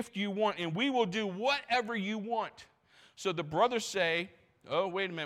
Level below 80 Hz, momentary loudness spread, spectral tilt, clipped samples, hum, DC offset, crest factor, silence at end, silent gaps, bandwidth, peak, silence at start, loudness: -74 dBFS; 6 LU; -4.5 dB/octave; under 0.1%; none; under 0.1%; 18 dB; 0 s; none; 15.5 kHz; -16 dBFS; 0 s; -32 LUFS